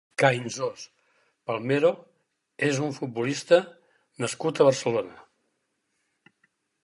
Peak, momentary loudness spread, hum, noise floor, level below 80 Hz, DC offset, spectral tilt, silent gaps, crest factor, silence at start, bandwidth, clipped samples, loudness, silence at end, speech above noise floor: -6 dBFS; 19 LU; none; -76 dBFS; -76 dBFS; under 0.1%; -5 dB/octave; none; 22 dB; 0.2 s; 11.5 kHz; under 0.1%; -25 LUFS; 1.6 s; 51 dB